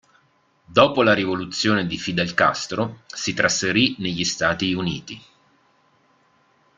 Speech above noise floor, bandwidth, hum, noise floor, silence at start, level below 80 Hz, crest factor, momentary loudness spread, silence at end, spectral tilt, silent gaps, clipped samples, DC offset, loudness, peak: 41 dB; 9.6 kHz; none; -62 dBFS; 0.7 s; -56 dBFS; 22 dB; 10 LU; 1.6 s; -3.5 dB/octave; none; under 0.1%; under 0.1%; -21 LUFS; -2 dBFS